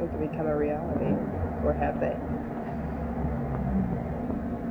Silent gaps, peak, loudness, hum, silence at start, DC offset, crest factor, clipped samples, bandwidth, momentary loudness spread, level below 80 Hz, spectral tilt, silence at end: none; -12 dBFS; -30 LUFS; none; 0 s; under 0.1%; 16 dB; under 0.1%; 6.2 kHz; 5 LU; -38 dBFS; -10.5 dB/octave; 0 s